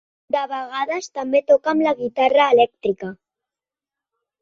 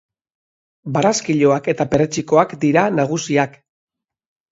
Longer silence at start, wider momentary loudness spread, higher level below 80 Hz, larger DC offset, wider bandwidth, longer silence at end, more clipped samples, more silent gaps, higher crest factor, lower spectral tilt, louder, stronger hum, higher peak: second, 0.35 s vs 0.85 s; first, 11 LU vs 4 LU; second, -66 dBFS vs -56 dBFS; neither; about the same, 7.6 kHz vs 7.8 kHz; first, 1.25 s vs 1.05 s; neither; neither; about the same, 18 dB vs 18 dB; about the same, -4.5 dB/octave vs -5.5 dB/octave; about the same, -19 LUFS vs -17 LUFS; neither; about the same, -2 dBFS vs 0 dBFS